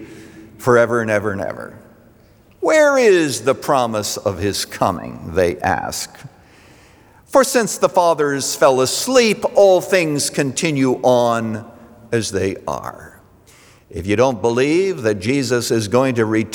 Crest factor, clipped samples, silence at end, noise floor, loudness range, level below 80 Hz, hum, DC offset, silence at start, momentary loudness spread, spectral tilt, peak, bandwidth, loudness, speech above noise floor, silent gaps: 16 dB; under 0.1%; 0 s; -49 dBFS; 6 LU; -54 dBFS; none; under 0.1%; 0 s; 13 LU; -4.5 dB/octave; -2 dBFS; over 20 kHz; -17 LUFS; 33 dB; none